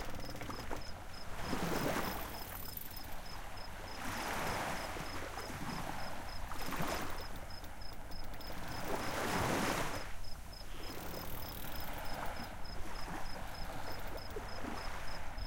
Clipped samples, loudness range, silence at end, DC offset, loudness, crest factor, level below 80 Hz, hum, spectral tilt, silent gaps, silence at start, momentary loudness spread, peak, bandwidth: under 0.1%; 5 LU; 0 s; under 0.1%; -42 LUFS; 16 dB; -48 dBFS; none; -4 dB/octave; none; 0 s; 11 LU; -22 dBFS; 17 kHz